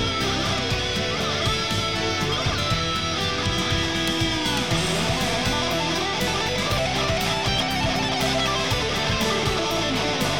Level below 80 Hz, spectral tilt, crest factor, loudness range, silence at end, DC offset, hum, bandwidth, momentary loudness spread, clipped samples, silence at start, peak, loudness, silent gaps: -38 dBFS; -3.5 dB/octave; 12 dB; 1 LU; 0 s; 0.7%; none; over 20 kHz; 1 LU; under 0.1%; 0 s; -10 dBFS; -22 LUFS; none